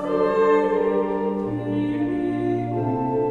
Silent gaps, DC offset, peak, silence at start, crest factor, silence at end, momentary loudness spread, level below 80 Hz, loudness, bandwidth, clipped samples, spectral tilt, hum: none; under 0.1%; -8 dBFS; 0 s; 14 dB; 0 s; 6 LU; -50 dBFS; -22 LUFS; 7.6 kHz; under 0.1%; -9 dB/octave; none